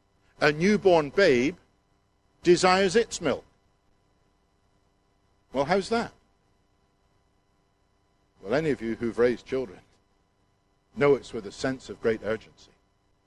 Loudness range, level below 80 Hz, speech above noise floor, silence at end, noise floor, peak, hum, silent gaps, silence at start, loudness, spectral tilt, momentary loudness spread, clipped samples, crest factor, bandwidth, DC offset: 9 LU; -58 dBFS; 44 dB; 0.9 s; -68 dBFS; -4 dBFS; none; none; 0.4 s; -25 LUFS; -5 dB/octave; 14 LU; under 0.1%; 24 dB; 11.5 kHz; under 0.1%